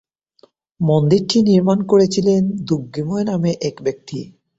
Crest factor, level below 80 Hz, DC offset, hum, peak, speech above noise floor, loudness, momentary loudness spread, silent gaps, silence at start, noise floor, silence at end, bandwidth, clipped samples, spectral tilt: 16 dB; -54 dBFS; under 0.1%; none; -2 dBFS; 38 dB; -17 LUFS; 11 LU; none; 0.8 s; -55 dBFS; 0.35 s; 8 kHz; under 0.1%; -7 dB/octave